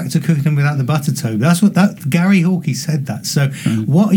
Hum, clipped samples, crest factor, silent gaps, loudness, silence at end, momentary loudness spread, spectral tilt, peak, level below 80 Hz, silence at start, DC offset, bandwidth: none; under 0.1%; 14 dB; none; -15 LUFS; 0 s; 6 LU; -6 dB/octave; 0 dBFS; -60 dBFS; 0 s; under 0.1%; 18.5 kHz